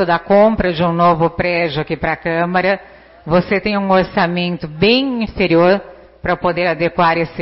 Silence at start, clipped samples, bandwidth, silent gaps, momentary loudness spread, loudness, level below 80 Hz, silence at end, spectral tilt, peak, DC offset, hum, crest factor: 0 s; under 0.1%; 5.8 kHz; none; 7 LU; -15 LUFS; -38 dBFS; 0 s; -10.5 dB/octave; -2 dBFS; under 0.1%; none; 12 dB